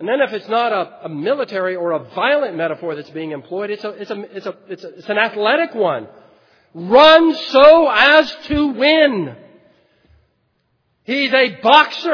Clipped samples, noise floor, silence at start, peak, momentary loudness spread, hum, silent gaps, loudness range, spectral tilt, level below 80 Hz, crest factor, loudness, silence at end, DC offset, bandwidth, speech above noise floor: 0.1%; -65 dBFS; 0 s; 0 dBFS; 19 LU; none; none; 10 LU; -5 dB/octave; -50 dBFS; 16 dB; -14 LUFS; 0 s; under 0.1%; 5.4 kHz; 50 dB